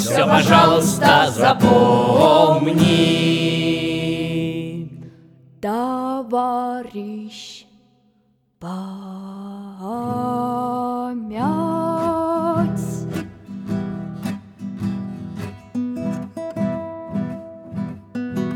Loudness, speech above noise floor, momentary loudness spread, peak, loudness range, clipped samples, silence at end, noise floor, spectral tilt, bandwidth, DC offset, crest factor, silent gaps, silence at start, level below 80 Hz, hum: -19 LUFS; 46 dB; 19 LU; 0 dBFS; 13 LU; under 0.1%; 0 s; -62 dBFS; -5.5 dB/octave; 19.5 kHz; under 0.1%; 20 dB; none; 0 s; -52 dBFS; none